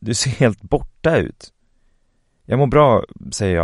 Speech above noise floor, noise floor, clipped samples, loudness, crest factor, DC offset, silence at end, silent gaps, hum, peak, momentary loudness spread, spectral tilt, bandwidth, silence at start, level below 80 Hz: 45 dB; -61 dBFS; under 0.1%; -18 LUFS; 18 dB; under 0.1%; 0 s; none; none; 0 dBFS; 10 LU; -5.5 dB/octave; 11.5 kHz; 0 s; -38 dBFS